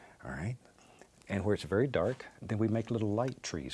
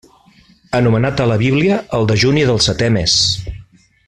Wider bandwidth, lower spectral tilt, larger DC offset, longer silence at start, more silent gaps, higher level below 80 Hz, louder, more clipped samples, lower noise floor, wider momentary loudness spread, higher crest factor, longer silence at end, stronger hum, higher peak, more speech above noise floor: about the same, 12 kHz vs 11 kHz; first, -6.5 dB/octave vs -4.5 dB/octave; neither; second, 0 s vs 0.7 s; neither; second, -60 dBFS vs -38 dBFS; second, -34 LUFS vs -14 LUFS; neither; first, -60 dBFS vs -49 dBFS; first, 10 LU vs 4 LU; first, 18 dB vs 12 dB; second, 0 s vs 0.45 s; neither; second, -16 dBFS vs -2 dBFS; second, 27 dB vs 35 dB